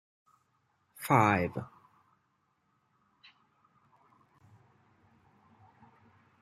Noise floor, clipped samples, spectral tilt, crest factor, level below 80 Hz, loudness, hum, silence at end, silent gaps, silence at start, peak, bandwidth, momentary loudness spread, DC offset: -76 dBFS; under 0.1%; -6.5 dB/octave; 28 dB; -72 dBFS; -29 LUFS; none; 4.75 s; none; 1 s; -10 dBFS; 15 kHz; 20 LU; under 0.1%